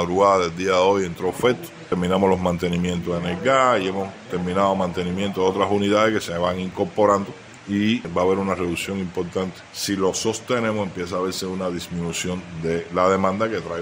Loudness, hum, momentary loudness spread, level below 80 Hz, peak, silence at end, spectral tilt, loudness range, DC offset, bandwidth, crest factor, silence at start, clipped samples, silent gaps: -22 LUFS; none; 9 LU; -56 dBFS; -4 dBFS; 0 s; -5 dB/octave; 4 LU; under 0.1%; 16 kHz; 18 dB; 0 s; under 0.1%; none